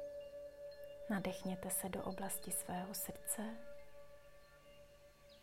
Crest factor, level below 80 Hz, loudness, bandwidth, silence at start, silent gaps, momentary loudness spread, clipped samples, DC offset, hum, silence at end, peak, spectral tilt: 22 dB; -70 dBFS; -44 LUFS; 16 kHz; 0 s; none; 22 LU; under 0.1%; under 0.1%; none; 0 s; -24 dBFS; -4 dB/octave